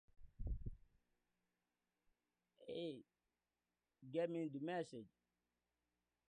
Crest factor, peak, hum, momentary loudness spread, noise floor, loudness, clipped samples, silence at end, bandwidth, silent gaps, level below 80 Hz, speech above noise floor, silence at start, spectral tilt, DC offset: 20 dB; -30 dBFS; 60 Hz at -85 dBFS; 16 LU; under -90 dBFS; -48 LUFS; under 0.1%; 1.2 s; 9.4 kHz; none; -60 dBFS; over 45 dB; 0.2 s; -7 dB/octave; under 0.1%